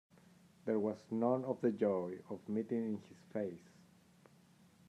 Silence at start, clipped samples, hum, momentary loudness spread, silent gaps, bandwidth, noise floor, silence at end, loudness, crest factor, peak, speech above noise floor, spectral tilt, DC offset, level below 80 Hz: 0.65 s; under 0.1%; none; 11 LU; none; 11 kHz; -66 dBFS; 1.3 s; -39 LUFS; 20 dB; -20 dBFS; 28 dB; -8.5 dB/octave; under 0.1%; -86 dBFS